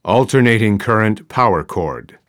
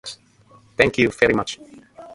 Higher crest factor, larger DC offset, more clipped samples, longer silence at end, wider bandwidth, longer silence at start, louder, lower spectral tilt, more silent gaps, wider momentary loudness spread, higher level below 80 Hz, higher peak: second, 14 dB vs 22 dB; neither; neither; first, 0.3 s vs 0 s; first, 16 kHz vs 11.5 kHz; about the same, 0.05 s vs 0.05 s; first, -15 LUFS vs -19 LUFS; first, -6.5 dB/octave vs -5 dB/octave; neither; second, 10 LU vs 19 LU; about the same, -44 dBFS vs -48 dBFS; about the same, 0 dBFS vs 0 dBFS